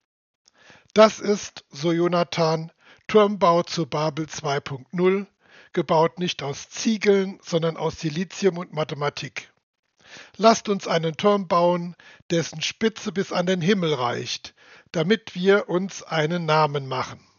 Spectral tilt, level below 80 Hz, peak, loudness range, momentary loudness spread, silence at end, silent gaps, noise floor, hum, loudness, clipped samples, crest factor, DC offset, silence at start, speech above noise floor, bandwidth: -4.5 dB/octave; -66 dBFS; 0 dBFS; 3 LU; 11 LU; 0.2 s; 9.63-9.73 s, 9.79-9.83 s, 12.22-12.29 s; -54 dBFS; none; -23 LUFS; under 0.1%; 24 dB; under 0.1%; 0.95 s; 31 dB; 7.2 kHz